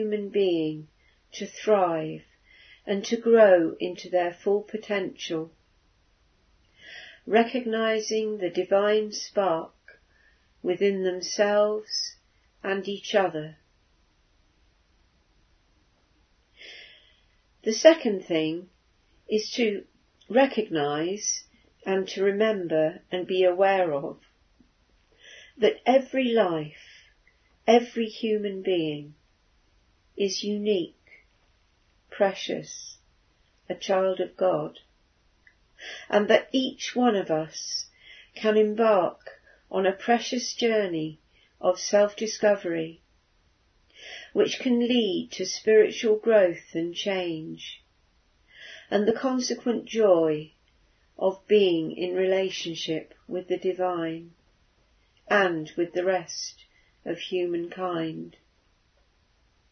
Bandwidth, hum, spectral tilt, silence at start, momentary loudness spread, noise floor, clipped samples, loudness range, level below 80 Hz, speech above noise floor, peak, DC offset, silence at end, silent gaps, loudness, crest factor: 6.6 kHz; none; -4 dB/octave; 0 s; 17 LU; -66 dBFS; under 0.1%; 6 LU; -68 dBFS; 41 dB; -2 dBFS; under 0.1%; 1.45 s; none; -25 LUFS; 24 dB